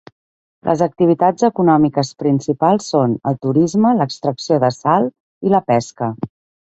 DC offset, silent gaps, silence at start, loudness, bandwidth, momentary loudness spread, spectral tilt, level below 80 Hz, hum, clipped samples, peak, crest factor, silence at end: under 0.1%; 5.20-5.41 s; 0.65 s; -16 LUFS; 8.2 kHz; 10 LU; -7 dB/octave; -56 dBFS; none; under 0.1%; -2 dBFS; 16 dB; 0.4 s